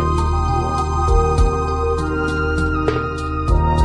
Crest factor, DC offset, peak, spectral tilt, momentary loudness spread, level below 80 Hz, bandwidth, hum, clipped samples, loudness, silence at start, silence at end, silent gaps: 14 dB; under 0.1%; -4 dBFS; -7 dB/octave; 4 LU; -20 dBFS; 10.5 kHz; none; under 0.1%; -19 LUFS; 0 s; 0 s; none